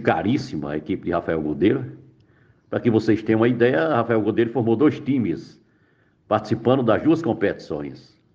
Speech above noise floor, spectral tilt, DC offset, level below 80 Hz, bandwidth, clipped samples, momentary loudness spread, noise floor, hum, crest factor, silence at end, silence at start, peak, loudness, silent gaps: 40 dB; -8 dB/octave; under 0.1%; -54 dBFS; 7.4 kHz; under 0.1%; 10 LU; -61 dBFS; none; 18 dB; 0.35 s; 0 s; -4 dBFS; -21 LUFS; none